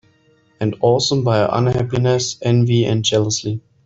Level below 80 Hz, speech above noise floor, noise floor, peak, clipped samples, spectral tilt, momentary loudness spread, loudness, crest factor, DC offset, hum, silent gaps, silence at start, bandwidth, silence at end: -48 dBFS; 40 dB; -56 dBFS; -4 dBFS; under 0.1%; -5.5 dB/octave; 7 LU; -17 LUFS; 14 dB; under 0.1%; none; none; 0.6 s; 7.8 kHz; 0.25 s